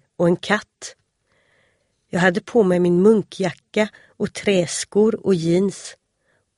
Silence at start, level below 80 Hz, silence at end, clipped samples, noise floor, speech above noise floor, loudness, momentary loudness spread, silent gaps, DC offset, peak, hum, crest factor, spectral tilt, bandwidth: 0.2 s; -60 dBFS; 0.65 s; under 0.1%; -67 dBFS; 48 dB; -19 LUFS; 13 LU; none; under 0.1%; -2 dBFS; none; 20 dB; -5.5 dB/octave; 11.5 kHz